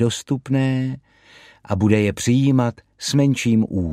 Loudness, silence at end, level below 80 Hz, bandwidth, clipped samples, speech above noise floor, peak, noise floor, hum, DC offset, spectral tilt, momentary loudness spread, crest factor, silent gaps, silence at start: -20 LUFS; 0 s; -48 dBFS; 14.5 kHz; under 0.1%; 30 dB; -2 dBFS; -49 dBFS; none; under 0.1%; -6 dB/octave; 10 LU; 18 dB; none; 0 s